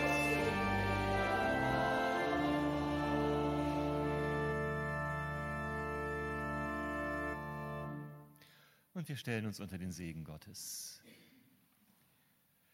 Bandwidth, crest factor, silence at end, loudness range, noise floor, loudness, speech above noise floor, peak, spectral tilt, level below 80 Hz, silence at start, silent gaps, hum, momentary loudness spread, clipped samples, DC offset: 16.5 kHz; 16 dB; 1.55 s; 10 LU; -73 dBFS; -37 LUFS; 30 dB; -22 dBFS; -5.5 dB/octave; -54 dBFS; 0 s; none; none; 12 LU; under 0.1%; under 0.1%